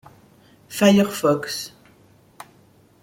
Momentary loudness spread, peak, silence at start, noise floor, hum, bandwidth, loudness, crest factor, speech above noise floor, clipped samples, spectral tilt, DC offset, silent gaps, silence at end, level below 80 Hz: 17 LU; -2 dBFS; 0.7 s; -54 dBFS; none; 16.5 kHz; -19 LUFS; 20 dB; 36 dB; under 0.1%; -5 dB/octave; under 0.1%; none; 1.35 s; -62 dBFS